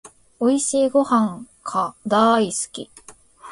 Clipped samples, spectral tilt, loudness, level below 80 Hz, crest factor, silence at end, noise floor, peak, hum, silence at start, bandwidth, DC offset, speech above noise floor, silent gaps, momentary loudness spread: under 0.1%; -4 dB/octave; -20 LUFS; -62 dBFS; 16 dB; 0 s; -44 dBFS; -4 dBFS; none; 0.4 s; 11.5 kHz; under 0.1%; 24 dB; none; 14 LU